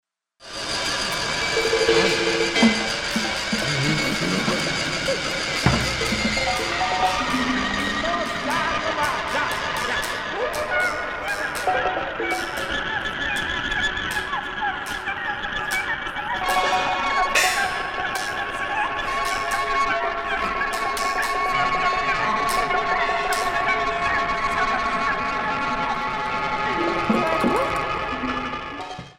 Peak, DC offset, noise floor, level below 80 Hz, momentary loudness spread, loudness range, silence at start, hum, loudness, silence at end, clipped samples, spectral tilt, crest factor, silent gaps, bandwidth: -2 dBFS; under 0.1%; -45 dBFS; -42 dBFS; 6 LU; 4 LU; 0.4 s; none; -22 LUFS; 0.05 s; under 0.1%; -3 dB/octave; 20 dB; none; 16.5 kHz